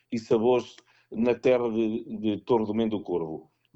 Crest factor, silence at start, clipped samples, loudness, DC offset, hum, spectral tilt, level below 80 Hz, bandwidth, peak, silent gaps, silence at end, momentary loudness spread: 16 dB; 0.1 s; under 0.1%; -27 LUFS; under 0.1%; none; -7 dB/octave; -62 dBFS; 8 kHz; -10 dBFS; none; 0.35 s; 13 LU